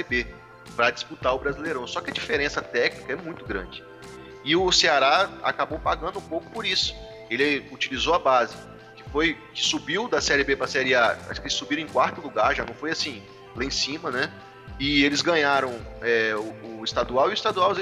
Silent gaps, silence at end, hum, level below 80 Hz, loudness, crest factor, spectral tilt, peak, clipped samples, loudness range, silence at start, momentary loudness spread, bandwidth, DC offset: none; 0 s; none; -46 dBFS; -24 LUFS; 20 dB; -3 dB/octave; -6 dBFS; under 0.1%; 4 LU; 0 s; 13 LU; 13.5 kHz; under 0.1%